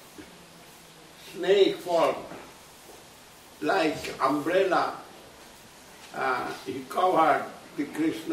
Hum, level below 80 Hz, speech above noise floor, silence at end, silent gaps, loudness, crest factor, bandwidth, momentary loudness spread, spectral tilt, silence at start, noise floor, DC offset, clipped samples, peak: none; -66 dBFS; 25 dB; 0 s; none; -26 LUFS; 20 dB; 16 kHz; 25 LU; -4.5 dB/octave; 0 s; -50 dBFS; under 0.1%; under 0.1%; -10 dBFS